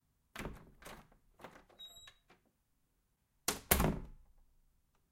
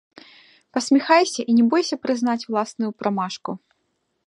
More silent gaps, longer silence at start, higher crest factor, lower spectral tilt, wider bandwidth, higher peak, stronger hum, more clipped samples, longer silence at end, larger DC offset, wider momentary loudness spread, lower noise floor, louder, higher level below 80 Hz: neither; second, 0.35 s vs 0.75 s; first, 32 dB vs 20 dB; about the same, -3.5 dB/octave vs -4 dB/octave; first, 16.5 kHz vs 11.5 kHz; second, -12 dBFS vs -2 dBFS; neither; neither; first, 0.95 s vs 0.7 s; neither; first, 26 LU vs 12 LU; first, -79 dBFS vs -72 dBFS; second, -37 LUFS vs -21 LUFS; first, -50 dBFS vs -76 dBFS